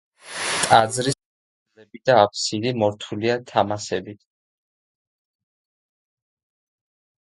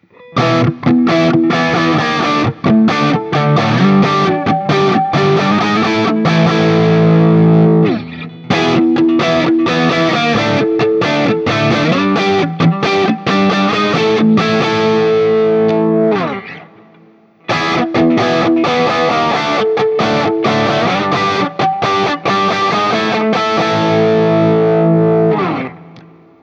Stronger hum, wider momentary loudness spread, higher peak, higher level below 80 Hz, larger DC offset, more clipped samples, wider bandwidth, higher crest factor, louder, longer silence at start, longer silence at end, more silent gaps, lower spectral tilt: neither; first, 13 LU vs 4 LU; about the same, 0 dBFS vs 0 dBFS; second, -60 dBFS vs -50 dBFS; neither; neither; first, 12 kHz vs 7.8 kHz; first, 24 dB vs 12 dB; second, -21 LUFS vs -12 LUFS; about the same, 0.25 s vs 0.3 s; first, 3.25 s vs 0.4 s; first, 1.25-1.66 s vs none; second, -3.5 dB/octave vs -6.5 dB/octave